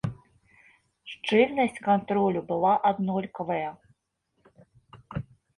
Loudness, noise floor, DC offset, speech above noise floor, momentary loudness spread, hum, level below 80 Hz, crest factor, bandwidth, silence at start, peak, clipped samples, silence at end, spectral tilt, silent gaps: -26 LUFS; -75 dBFS; under 0.1%; 50 dB; 16 LU; none; -60 dBFS; 20 dB; 11.5 kHz; 0.05 s; -8 dBFS; under 0.1%; 0.35 s; -7 dB/octave; none